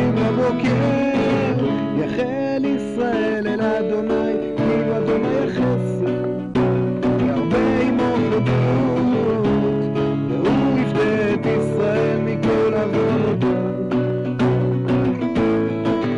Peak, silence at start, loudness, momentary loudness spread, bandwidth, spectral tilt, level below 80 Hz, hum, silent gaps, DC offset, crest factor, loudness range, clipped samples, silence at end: -14 dBFS; 0 s; -19 LUFS; 3 LU; 10.5 kHz; -8.5 dB/octave; -44 dBFS; none; none; under 0.1%; 6 dB; 2 LU; under 0.1%; 0 s